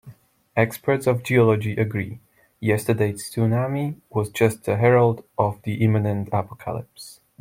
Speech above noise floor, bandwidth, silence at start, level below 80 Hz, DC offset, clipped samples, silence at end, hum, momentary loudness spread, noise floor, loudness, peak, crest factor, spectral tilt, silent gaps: 26 dB; 16.5 kHz; 0.05 s; -58 dBFS; under 0.1%; under 0.1%; 0.3 s; none; 14 LU; -47 dBFS; -22 LUFS; -2 dBFS; 20 dB; -7 dB/octave; none